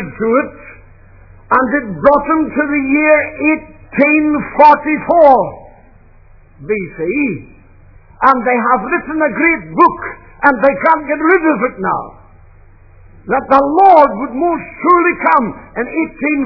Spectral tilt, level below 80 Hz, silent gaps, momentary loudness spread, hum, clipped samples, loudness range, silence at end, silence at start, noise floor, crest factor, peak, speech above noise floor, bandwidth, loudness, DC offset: -9 dB/octave; -42 dBFS; none; 12 LU; none; 0.4%; 4 LU; 0 s; 0 s; -42 dBFS; 14 dB; 0 dBFS; 30 dB; 5.4 kHz; -12 LUFS; under 0.1%